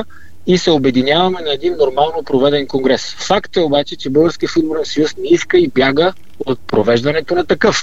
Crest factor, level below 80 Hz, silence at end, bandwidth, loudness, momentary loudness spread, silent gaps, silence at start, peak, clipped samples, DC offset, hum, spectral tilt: 14 dB; -44 dBFS; 0 s; 8 kHz; -14 LUFS; 5 LU; none; 0 s; 0 dBFS; under 0.1%; 3%; none; -5 dB/octave